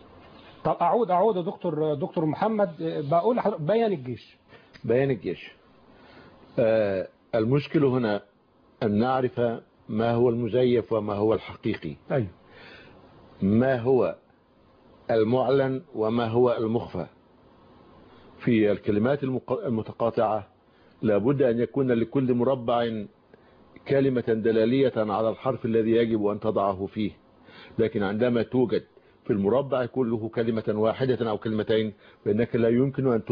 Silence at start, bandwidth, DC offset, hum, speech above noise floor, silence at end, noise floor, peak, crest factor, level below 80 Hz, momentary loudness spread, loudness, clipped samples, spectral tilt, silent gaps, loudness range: 0.35 s; 5.2 kHz; under 0.1%; none; 36 dB; 0 s; -60 dBFS; -10 dBFS; 14 dB; -60 dBFS; 9 LU; -25 LUFS; under 0.1%; -10.5 dB/octave; none; 3 LU